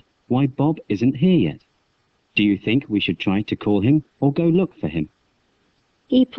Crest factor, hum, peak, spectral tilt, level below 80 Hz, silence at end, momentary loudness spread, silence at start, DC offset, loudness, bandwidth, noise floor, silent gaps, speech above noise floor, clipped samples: 16 dB; none; -6 dBFS; -9 dB/octave; -52 dBFS; 0 s; 8 LU; 0.3 s; under 0.1%; -20 LUFS; 6.2 kHz; -66 dBFS; none; 47 dB; under 0.1%